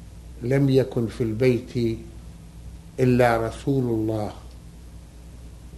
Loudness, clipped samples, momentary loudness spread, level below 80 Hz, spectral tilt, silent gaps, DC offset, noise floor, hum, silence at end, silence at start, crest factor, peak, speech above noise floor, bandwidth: -23 LUFS; under 0.1%; 25 LU; -42 dBFS; -7.5 dB/octave; none; under 0.1%; -42 dBFS; none; 0 s; 0 s; 18 dB; -6 dBFS; 21 dB; 12.5 kHz